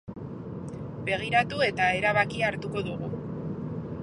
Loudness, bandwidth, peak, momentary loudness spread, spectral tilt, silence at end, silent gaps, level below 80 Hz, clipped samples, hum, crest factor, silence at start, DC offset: -28 LUFS; 11 kHz; -8 dBFS; 14 LU; -6 dB/octave; 0 s; none; -54 dBFS; under 0.1%; none; 20 dB; 0.05 s; under 0.1%